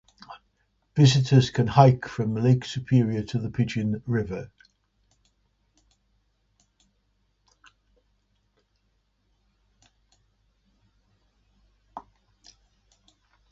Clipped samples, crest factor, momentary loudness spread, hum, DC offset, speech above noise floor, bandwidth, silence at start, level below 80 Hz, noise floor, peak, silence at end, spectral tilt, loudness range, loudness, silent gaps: under 0.1%; 24 dB; 27 LU; none; under 0.1%; 49 dB; 7.8 kHz; 0.3 s; -56 dBFS; -71 dBFS; -4 dBFS; 1.55 s; -7 dB/octave; 14 LU; -23 LUFS; none